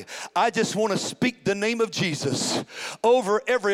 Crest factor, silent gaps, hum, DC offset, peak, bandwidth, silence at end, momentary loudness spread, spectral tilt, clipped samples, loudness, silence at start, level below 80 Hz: 14 dB; none; none; under 0.1%; -10 dBFS; 16 kHz; 0 s; 5 LU; -4 dB/octave; under 0.1%; -24 LUFS; 0 s; -66 dBFS